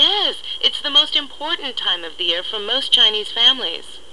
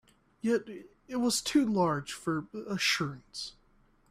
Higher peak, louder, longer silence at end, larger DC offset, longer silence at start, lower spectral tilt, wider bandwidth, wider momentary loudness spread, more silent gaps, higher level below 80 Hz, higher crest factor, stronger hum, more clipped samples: first, -2 dBFS vs -14 dBFS; first, -16 LUFS vs -31 LUFS; second, 0.15 s vs 0.6 s; first, 2% vs under 0.1%; second, 0 s vs 0.45 s; second, -0.5 dB/octave vs -4 dB/octave; second, 12 kHz vs 15 kHz; second, 10 LU vs 14 LU; neither; first, -56 dBFS vs -64 dBFS; about the same, 16 dB vs 18 dB; neither; neither